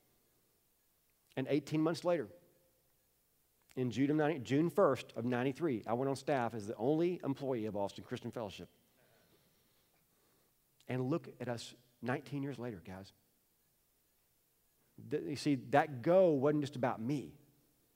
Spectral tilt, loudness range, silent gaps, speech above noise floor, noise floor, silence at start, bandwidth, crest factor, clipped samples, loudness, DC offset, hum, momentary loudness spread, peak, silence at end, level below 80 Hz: -7 dB/octave; 11 LU; none; 40 dB; -76 dBFS; 1.35 s; 16 kHz; 24 dB; under 0.1%; -36 LUFS; under 0.1%; none; 14 LU; -14 dBFS; 0.6 s; -78 dBFS